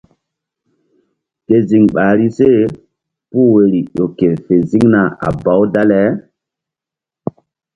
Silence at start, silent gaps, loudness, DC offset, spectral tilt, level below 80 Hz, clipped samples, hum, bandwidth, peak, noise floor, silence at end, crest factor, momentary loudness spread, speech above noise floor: 1.5 s; none; -12 LUFS; under 0.1%; -9.5 dB/octave; -46 dBFS; under 0.1%; none; 7.6 kHz; 0 dBFS; -86 dBFS; 1.55 s; 14 dB; 11 LU; 75 dB